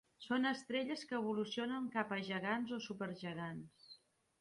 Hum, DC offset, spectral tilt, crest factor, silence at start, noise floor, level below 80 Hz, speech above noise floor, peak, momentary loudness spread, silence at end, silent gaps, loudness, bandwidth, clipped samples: none; under 0.1%; -5.5 dB/octave; 18 dB; 0.2 s; -65 dBFS; -80 dBFS; 25 dB; -22 dBFS; 15 LU; 0.45 s; none; -41 LUFS; 11.5 kHz; under 0.1%